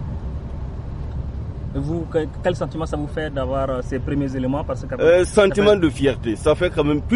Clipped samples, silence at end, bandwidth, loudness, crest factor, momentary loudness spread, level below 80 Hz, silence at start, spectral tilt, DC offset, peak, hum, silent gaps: under 0.1%; 0 s; 11.5 kHz; -21 LUFS; 16 dB; 15 LU; -32 dBFS; 0 s; -6.5 dB/octave; under 0.1%; -4 dBFS; none; none